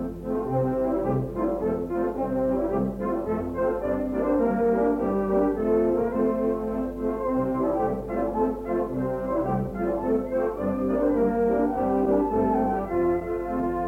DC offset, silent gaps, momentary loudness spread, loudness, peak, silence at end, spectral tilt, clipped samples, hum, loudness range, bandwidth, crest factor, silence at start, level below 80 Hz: under 0.1%; none; 5 LU; -25 LUFS; -12 dBFS; 0 s; -10 dB/octave; under 0.1%; none; 2 LU; 16.5 kHz; 12 dB; 0 s; -44 dBFS